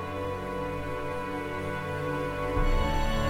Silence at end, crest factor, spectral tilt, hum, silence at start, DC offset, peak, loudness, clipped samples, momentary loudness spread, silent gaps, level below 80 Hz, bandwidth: 0 s; 14 dB; -6 dB/octave; none; 0 s; under 0.1%; -14 dBFS; -32 LUFS; under 0.1%; 5 LU; none; -34 dBFS; 15.5 kHz